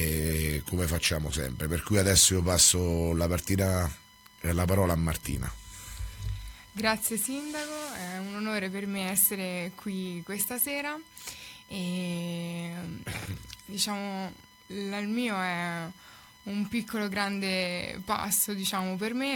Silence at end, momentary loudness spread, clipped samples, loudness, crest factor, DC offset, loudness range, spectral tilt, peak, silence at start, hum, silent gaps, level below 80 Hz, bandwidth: 0 s; 15 LU; under 0.1%; -29 LUFS; 22 dB; under 0.1%; 10 LU; -3.5 dB/octave; -8 dBFS; 0 s; none; none; -44 dBFS; 18.5 kHz